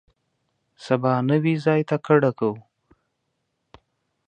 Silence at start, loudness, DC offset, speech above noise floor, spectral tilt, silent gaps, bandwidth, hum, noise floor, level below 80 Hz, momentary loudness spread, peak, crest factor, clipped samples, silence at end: 0.8 s; -21 LUFS; under 0.1%; 55 dB; -8.5 dB/octave; none; 9.2 kHz; none; -76 dBFS; -68 dBFS; 8 LU; -2 dBFS; 22 dB; under 0.1%; 1.7 s